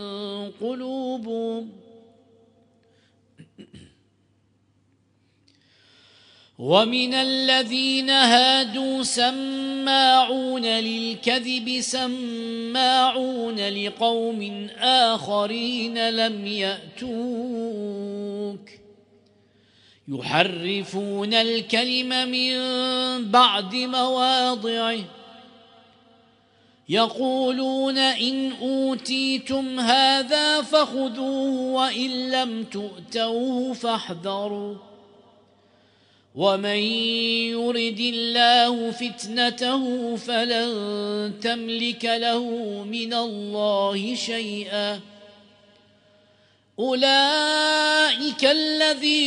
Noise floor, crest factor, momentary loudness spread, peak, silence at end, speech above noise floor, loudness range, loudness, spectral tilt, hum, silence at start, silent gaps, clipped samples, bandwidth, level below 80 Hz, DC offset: -64 dBFS; 22 dB; 12 LU; -2 dBFS; 0 s; 41 dB; 9 LU; -22 LUFS; -3 dB/octave; none; 0 s; none; under 0.1%; 10.5 kHz; -72 dBFS; under 0.1%